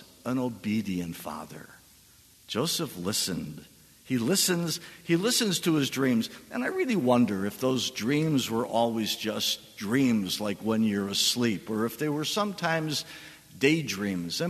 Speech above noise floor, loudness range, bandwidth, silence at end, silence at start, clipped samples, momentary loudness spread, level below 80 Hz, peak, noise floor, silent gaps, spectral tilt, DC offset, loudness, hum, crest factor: 29 dB; 6 LU; 13.5 kHz; 0 s; 0 s; under 0.1%; 10 LU; -66 dBFS; -8 dBFS; -57 dBFS; none; -4 dB/octave; under 0.1%; -28 LUFS; none; 20 dB